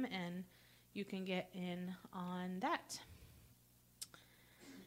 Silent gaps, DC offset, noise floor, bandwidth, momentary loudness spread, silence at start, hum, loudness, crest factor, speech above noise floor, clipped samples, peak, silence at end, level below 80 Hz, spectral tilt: none; under 0.1%; -69 dBFS; 16 kHz; 22 LU; 0 s; 60 Hz at -60 dBFS; -46 LUFS; 22 dB; 25 dB; under 0.1%; -26 dBFS; 0 s; -76 dBFS; -5 dB/octave